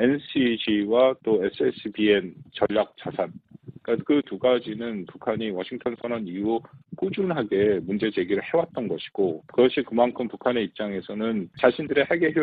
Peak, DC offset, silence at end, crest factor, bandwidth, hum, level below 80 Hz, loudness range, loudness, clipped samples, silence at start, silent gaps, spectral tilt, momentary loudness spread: -4 dBFS; under 0.1%; 0 s; 20 dB; 4.8 kHz; none; -62 dBFS; 4 LU; -25 LUFS; under 0.1%; 0 s; none; -10 dB/octave; 9 LU